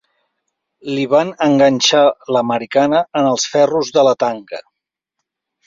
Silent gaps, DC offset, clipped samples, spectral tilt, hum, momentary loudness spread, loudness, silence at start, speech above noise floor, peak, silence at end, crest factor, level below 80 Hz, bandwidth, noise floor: none; under 0.1%; under 0.1%; -4 dB/octave; none; 13 LU; -14 LUFS; 0.85 s; 65 dB; -2 dBFS; 1.05 s; 14 dB; -60 dBFS; 7.6 kHz; -80 dBFS